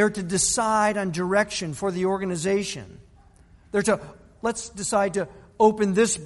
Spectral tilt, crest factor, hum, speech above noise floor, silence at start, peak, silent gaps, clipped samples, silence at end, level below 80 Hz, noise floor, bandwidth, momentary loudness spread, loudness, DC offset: -4 dB/octave; 18 dB; none; 30 dB; 0 s; -6 dBFS; none; under 0.1%; 0 s; -52 dBFS; -53 dBFS; 11.5 kHz; 9 LU; -24 LUFS; under 0.1%